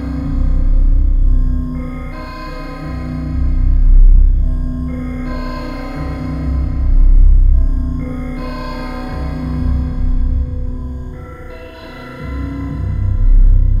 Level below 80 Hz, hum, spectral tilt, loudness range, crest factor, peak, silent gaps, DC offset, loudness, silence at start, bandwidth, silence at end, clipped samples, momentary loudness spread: -12 dBFS; none; -9 dB/octave; 4 LU; 12 dB; 0 dBFS; none; under 0.1%; -19 LUFS; 0 s; 5 kHz; 0 s; under 0.1%; 14 LU